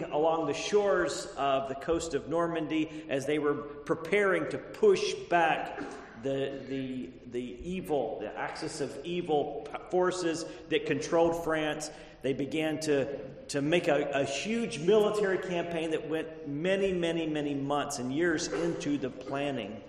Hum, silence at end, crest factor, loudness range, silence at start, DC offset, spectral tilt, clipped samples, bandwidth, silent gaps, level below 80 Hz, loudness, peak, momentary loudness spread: none; 0 s; 20 dB; 4 LU; 0 s; under 0.1%; -4.5 dB/octave; under 0.1%; 13 kHz; none; -58 dBFS; -31 LUFS; -12 dBFS; 10 LU